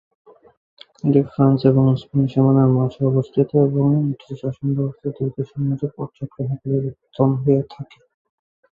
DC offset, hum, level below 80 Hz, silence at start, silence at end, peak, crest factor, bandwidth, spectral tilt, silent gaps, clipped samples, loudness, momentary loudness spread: under 0.1%; none; -54 dBFS; 1.05 s; 0.9 s; -2 dBFS; 18 dB; 5 kHz; -11.5 dB/octave; none; under 0.1%; -19 LUFS; 13 LU